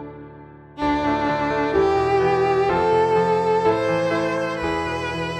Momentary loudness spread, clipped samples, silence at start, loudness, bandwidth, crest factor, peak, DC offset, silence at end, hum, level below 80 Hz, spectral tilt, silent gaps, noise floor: 6 LU; under 0.1%; 0 s; -20 LUFS; 10 kHz; 14 dB; -8 dBFS; under 0.1%; 0 s; none; -44 dBFS; -6.5 dB/octave; none; -42 dBFS